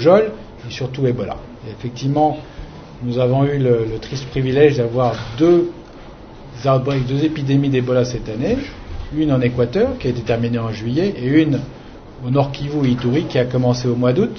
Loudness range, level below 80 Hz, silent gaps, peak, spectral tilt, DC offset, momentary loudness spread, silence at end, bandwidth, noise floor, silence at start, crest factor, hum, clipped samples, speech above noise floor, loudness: 3 LU; -40 dBFS; none; 0 dBFS; -7.5 dB/octave; under 0.1%; 19 LU; 0 s; 6.6 kHz; -37 dBFS; 0 s; 18 dB; none; under 0.1%; 20 dB; -18 LUFS